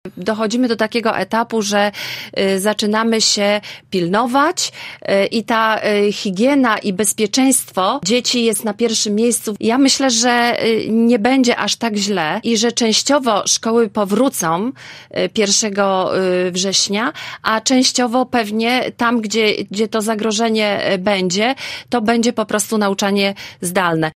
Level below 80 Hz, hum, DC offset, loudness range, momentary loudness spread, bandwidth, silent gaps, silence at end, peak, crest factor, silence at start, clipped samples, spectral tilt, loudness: -60 dBFS; none; under 0.1%; 2 LU; 6 LU; 16 kHz; none; 0.05 s; -2 dBFS; 14 dB; 0.05 s; under 0.1%; -3 dB/octave; -16 LUFS